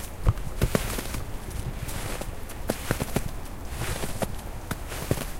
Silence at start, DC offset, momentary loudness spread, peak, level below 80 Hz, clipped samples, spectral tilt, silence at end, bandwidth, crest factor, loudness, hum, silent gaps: 0 s; under 0.1%; 9 LU; -4 dBFS; -34 dBFS; under 0.1%; -5 dB/octave; 0 s; 17 kHz; 24 dB; -32 LUFS; none; none